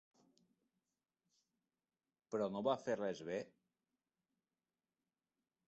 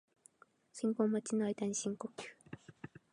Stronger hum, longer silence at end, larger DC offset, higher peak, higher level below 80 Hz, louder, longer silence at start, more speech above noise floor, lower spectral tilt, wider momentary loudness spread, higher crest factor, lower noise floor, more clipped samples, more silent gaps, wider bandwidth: neither; first, 2.2 s vs 0.25 s; neither; second, -24 dBFS vs -20 dBFS; about the same, -86 dBFS vs -82 dBFS; second, -42 LUFS vs -37 LUFS; first, 2.3 s vs 0.75 s; first, over 49 dB vs 30 dB; about the same, -4.5 dB/octave vs -5 dB/octave; second, 8 LU vs 20 LU; about the same, 24 dB vs 20 dB; first, under -90 dBFS vs -67 dBFS; neither; neither; second, 8 kHz vs 11 kHz